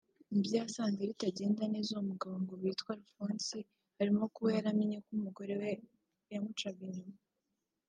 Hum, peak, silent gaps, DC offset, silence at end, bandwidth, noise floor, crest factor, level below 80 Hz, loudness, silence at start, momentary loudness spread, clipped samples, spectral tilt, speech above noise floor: none; -20 dBFS; none; under 0.1%; 0.75 s; 9.4 kHz; -87 dBFS; 18 dB; -84 dBFS; -37 LUFS; 0.3 s; 12 LU; under 0.1%; -5.5 dB/octave; 50 dB